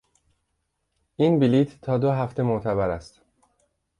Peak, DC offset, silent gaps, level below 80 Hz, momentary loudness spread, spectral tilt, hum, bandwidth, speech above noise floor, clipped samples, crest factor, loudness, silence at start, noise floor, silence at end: -10 dBFS; under 0.1%; none; -52 dBFS; 6 LU; -9 dB/octave; none; 10.5 kHz; 54 dB; under 0.1%; 16 dB; -23 LUFS; 1.2 s; -76 dBFS; 0.95 s